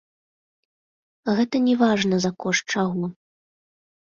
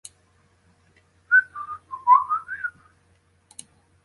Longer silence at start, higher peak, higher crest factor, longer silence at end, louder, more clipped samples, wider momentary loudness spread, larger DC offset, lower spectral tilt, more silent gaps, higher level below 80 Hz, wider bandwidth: about the same, 1.25 s vs 1.3 s; about the same, -6 dBFS vs -6 dBFS; about the same, 18 dB vs 20 dB; second, 0.95 s vs 1.35 s; about the same, -22 LUFS vs -21 LUFS; neither; second, 10 LU vs 26 LU; neither; first, -5 dB/octave vs -0.5 dB/octave; neither; about the same, -64 dBFS vs -68 dBFS; second, 7.4 kHz vs 11.5 kHz